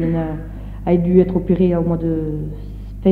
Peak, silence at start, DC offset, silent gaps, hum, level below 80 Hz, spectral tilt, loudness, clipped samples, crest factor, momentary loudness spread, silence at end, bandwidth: -2 dBFS; 0 s; under 0.1%; none; none; -32 dBFS; -11 dB/octave; -18 LUFS; under 0.1%; 16 dB; 16 LU; 0 s; 4.2 kHz